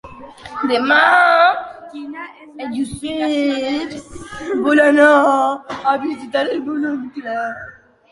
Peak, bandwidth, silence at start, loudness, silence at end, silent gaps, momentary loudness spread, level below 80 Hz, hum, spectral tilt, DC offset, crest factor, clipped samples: -2 dBFS; 11.5 kHz; 0.05 s; -16 LUFS; 0.4 s; none; 22 LU; -52 dBFS; none; -4 dB/octave; under 0.1%; 16 dB; under 0.1%